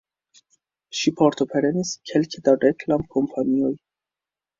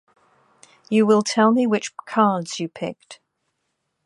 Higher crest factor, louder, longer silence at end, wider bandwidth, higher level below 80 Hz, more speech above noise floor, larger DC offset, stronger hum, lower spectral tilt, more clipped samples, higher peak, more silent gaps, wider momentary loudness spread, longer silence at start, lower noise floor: about the same, 20 dB vs 18 dB; about the same, -22 LUFS vs -20 LUFS; about the same, 0.85 s vs 0.9 s; second, 7.6 kHz vs 11 kHz; first, -58 dBFS vs -72 dBFS; first, 69 dB vs 55 dB; neither; neither; about the same, -5.5 dB/octave vs -5 dB/octave; neither; about the same, -4 dBFS vs -4 dBFS; neither; second, 7 LU vs 14 LU; about the same, 0.95 s vs 0.9 s; first, -90 dBFS vs -75 dBFS